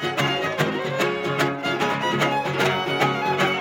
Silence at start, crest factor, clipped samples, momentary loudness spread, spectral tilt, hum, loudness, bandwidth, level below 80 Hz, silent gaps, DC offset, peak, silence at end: 0 s; 16 dB; under 0.1%; 2 LU; -4.5 dB/octave; none; -22 LUFS; 17 kHz; -62 dBFS; none; under 0.1%; -6 dBFS; 0 s